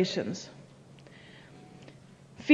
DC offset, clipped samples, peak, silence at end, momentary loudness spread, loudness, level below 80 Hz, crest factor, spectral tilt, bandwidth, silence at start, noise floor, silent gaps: under 0.1%; under 0.1%; -8 dBFS; 0 s; 19 LU; -36 LUFS; -72 dBFS; 24 dB; -5 dB/octave; 10.5 kHz; 0 s; -54 dBFS; none